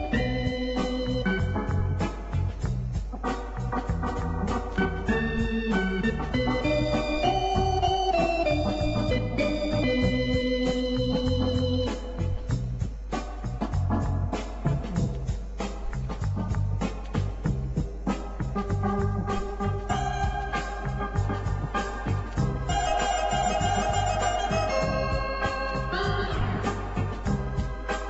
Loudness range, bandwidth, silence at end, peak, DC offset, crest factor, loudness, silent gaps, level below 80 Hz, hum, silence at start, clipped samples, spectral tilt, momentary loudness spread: 5 LU; 8.2 kHz; 0 s; -12 dBFS; under 0.1%; 14 dB; -28 LUFS; none; -34 dBFS; none; 0 s; under 0.1%; -6 dB/octave; 7 LU